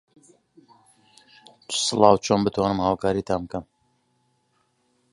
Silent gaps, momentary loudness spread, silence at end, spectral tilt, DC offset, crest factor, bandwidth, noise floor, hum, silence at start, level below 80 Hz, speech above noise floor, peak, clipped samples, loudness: none; 11 LU; 1.5 s; -4.5 dB/octave; under 0.1%; 24 dB; 11.5 kHz; -69 dBFS; none; 1.7 s; -52 dBFS; 47 dB; -2 dBFS; under 0.1%; -22 LUFS